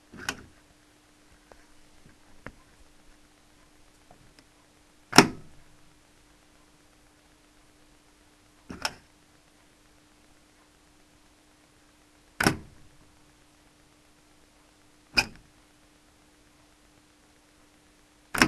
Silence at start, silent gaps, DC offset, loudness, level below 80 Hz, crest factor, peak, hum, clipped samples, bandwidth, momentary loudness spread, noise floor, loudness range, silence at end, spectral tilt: 0.2 s; none; under 0.1%; -26 LUFS; -58 dBFS; 34 dB; 0 dBFS; none; under 0.1%; 13 kHz; 29 LU; -60 dBFS; 15 LU; 0 s; -3 dB/octave